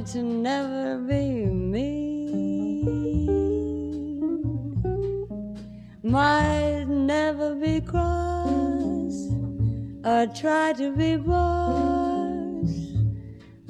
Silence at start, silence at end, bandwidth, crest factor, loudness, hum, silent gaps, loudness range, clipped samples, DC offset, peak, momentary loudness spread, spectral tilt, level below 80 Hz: 0 s; 0 s; 10.5 kHz; 16 dB; -25 LUFS; none; none; 3 LU; under 0.1%; under 0.1%; -8 dBFS; 7 LU; -7 dB/octave; -38 dBFS